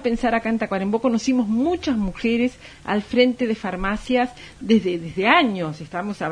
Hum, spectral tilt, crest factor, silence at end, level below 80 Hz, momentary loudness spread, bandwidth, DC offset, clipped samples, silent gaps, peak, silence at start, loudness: none; -5.5 dB/octave; 18 dB; 0 s; -44 dBFS; 10 LU; 10 kHz; under 0.1%; under 0.1%; none; -2 dBFS; 0 s; -21 LUFS